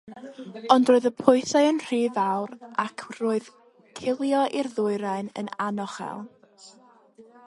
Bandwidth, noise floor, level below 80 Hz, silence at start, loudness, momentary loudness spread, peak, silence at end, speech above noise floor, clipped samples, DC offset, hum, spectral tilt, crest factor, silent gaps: 11.5 kHz; -55 dBFS; -72 dBFS; 0.05 s; -25 LUFS; 18 LU; -2 dBFS; 0.25 s; 31 dB; under 0.1%; under 0.1%; none; -5 dB/octave; 24 dB; none